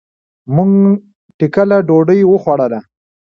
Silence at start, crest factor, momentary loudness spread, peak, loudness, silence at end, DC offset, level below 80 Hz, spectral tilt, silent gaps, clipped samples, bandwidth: 0.5 s; 12 dB; 9 LU; 0 dBFS; -12 LUFS; 0.5 s; under 0.1%; -54 dBFS; -10.5 dB/octave; 1.15-1.39 s; under 0.1%; 6 kHz